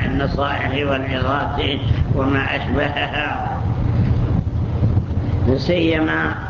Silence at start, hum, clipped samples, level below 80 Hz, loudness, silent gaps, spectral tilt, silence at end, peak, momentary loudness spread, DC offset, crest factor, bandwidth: 0 s; none; under 0.1%; -26 dBFS; -19 LUFS; none; -8 dB/octave; 0 s; -6 dBFS; 4 LU; under 0.1%; 14 dB; 7 kHz